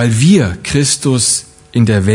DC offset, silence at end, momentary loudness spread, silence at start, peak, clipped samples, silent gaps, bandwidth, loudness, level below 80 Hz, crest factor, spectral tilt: under 0.1%; 0 s; 6 LU; 0 s; 0 dBFS; under 0.1%; none; 11 kHz; -12 LUFS; -42 dBFS; 12 dB; -4.5 dB/octave